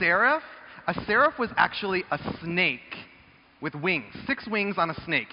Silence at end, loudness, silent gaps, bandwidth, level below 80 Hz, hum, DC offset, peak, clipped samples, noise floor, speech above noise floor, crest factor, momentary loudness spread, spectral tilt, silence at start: 0.05 s; -26 LUFS; none; 5.6 kHz; -58 dBFS; none; under 0.1%; -6 dBFS; under 0.1%; -55 dBFS; 29 dB; 20 dB; 14 LU; -2.5 dB/octave; 0 s